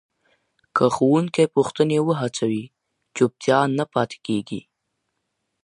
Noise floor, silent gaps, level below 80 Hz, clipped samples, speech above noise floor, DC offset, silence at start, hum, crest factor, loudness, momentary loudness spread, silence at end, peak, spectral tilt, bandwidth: -76 dBFS; none; -64 dBFS; under 0.1%; 56 dB; under 0.1%; 0.75 s; none; 20 dB; -21 LUFS; 8 LU; 1.05 s; -2 dBFS; -6 dB/octave; 11 kHz